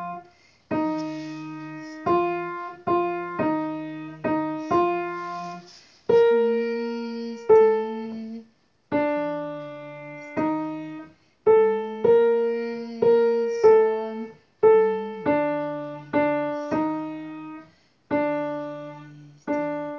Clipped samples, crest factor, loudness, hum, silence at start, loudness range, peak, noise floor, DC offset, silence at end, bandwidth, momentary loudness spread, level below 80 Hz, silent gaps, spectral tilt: under 0.1%; 18 dB; -24 LUFS; none; 0 s; 8 LU; -6 dBFS; -57 dBFS; under 0.1%; 0 s; 6.6 kHz; 19 LU; -62 dBFS; none; -7.5 dB/octave